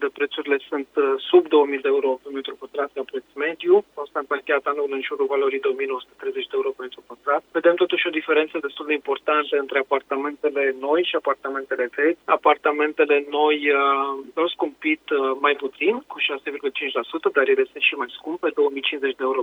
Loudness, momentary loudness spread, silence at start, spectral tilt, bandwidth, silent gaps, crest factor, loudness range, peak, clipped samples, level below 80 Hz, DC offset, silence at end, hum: -22 LUFS; 9 LU; 0 s; -4.5 dB/octave; 4.2 kHz; none; 18 dB; 3 LU; -4 dBFS; under 0.1%; -74 dBFS; under 0.1%; 0 s; none